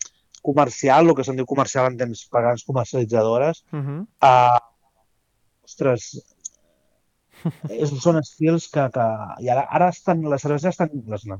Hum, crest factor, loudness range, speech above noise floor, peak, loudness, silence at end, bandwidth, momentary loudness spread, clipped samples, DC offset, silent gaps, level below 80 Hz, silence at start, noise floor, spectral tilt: none; 18 dB; 6 LU; 47 dB; -2 dBFS; -20 LUFS; 0 s; 8 kHz; 15 LU; under 0.1%; under 0.1%; none; -64 dBFS; 0 s; -67 dBFS; -6 dB/octave